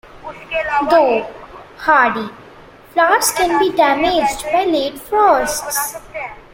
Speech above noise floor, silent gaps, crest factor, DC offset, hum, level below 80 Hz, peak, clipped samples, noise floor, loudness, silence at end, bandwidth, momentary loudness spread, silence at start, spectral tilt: 26 dB; none; 16 dB; under 0.1%; none; -46 dBFS; 0 dBFS; under 0.1%; -41 dBFS; -15 LUFS; 0.1 s; 16.5 kHz; 16 LU; 0.05 s; -2 dB/octave